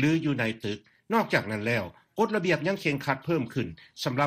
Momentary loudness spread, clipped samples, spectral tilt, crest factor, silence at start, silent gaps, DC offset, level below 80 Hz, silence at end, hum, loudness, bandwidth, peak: 10 LU; under 0.1%; -6 dB/octave; 18 dB; 0 s; none; under 0.1%; -62 dBFS; 0 s; none; -28 LUFS; 15.5 kHz; -10 dBFS